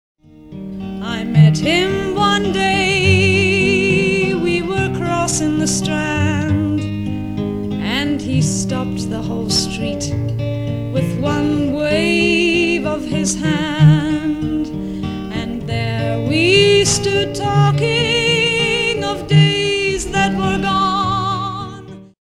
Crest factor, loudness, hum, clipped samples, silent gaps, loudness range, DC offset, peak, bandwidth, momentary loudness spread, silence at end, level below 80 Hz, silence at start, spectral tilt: 16 dB; -16 LUFS; none; under 0.1%; none; 5 LU; under 0.1%; 0 dBFS; 13 kHz; 10 LU; 0.3 s; -38 dBFS; 0.4 s; -5 dB/octave